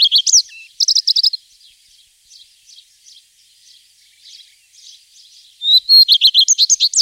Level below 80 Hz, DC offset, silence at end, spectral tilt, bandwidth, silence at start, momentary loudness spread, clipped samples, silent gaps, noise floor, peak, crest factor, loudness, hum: -74 dBFS; under 0.1%; 0 s; 9 dB/octave; 16 kHz; 0 s; 11 LU; under 0.1%; none; -51 dBFS; -2 dBFS; 16 dB; -9 LUFS; none